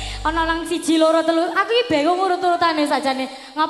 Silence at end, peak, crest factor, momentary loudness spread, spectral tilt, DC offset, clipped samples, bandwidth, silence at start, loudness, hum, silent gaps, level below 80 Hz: 0 s; -4 dBFS; 14 dB; 6 LU; -3.5 dB/octave; under 0.1%; under 0.1%; 13.5 kHz; 0 s; -19 LUFS; none; none; -40 dBFS